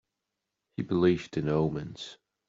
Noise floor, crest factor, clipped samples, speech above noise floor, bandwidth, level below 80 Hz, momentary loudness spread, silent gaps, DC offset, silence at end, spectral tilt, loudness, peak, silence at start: -85 dBFS; 20 dB; under 0.1%; 57 dB; 7.6 kHz; -58 dBFS; 17 LU; none; under 0.1%; 0.35 s; -7.5 dB/octave; -29 LUFS; -12 dBFS; 0.8 s